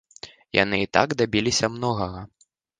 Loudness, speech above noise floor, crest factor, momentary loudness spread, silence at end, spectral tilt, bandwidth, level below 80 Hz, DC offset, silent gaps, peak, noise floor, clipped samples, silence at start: -23 LUFS; 23 dB; 24 dB; 18 LU; 0.55 s; -4 dB/octave; 10 kHz; -50 dBFS; under 0.1%; none; 0 dBFS; -46 dBFS; under 0.1%; 0.25 s